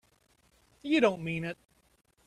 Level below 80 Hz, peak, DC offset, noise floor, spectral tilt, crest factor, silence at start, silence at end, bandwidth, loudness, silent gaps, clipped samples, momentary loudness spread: -66 dBFS; -12 dBFS; under 0.1%; -68 dBFS; -6 dB/octave; 22 dB; 0.85 s; 0.75 s; 12 kHz; -30 LUFS; none; under 0.1%; 18 LU